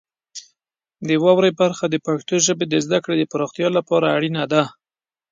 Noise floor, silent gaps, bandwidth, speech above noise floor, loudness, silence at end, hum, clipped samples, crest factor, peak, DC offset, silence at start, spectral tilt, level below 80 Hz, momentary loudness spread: under -90 dBFS; none; 9.6 kHz; over 72 dB; -19 LUFS; 0.6 s; none; under 0.1%; 18 dB; -2 dBFS; under 0.1%; 0.35 s; -4.5 dB/octave; -66 dBFS; 15 LU